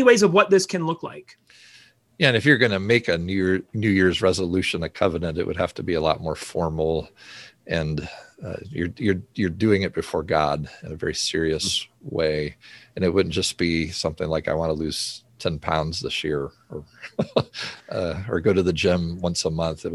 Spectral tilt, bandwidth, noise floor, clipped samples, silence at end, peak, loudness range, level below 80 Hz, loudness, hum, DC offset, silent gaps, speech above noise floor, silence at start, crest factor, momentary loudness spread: -5 dB/octave; 12.5 kHz; -50 dBFS; under 0.1%; 0 s; -2 dBFS; 6 LU; -42 dBFS; -23 LUFS; none; under 0.1%; none; 27 dB; 0 s; 22 dB; 14 LU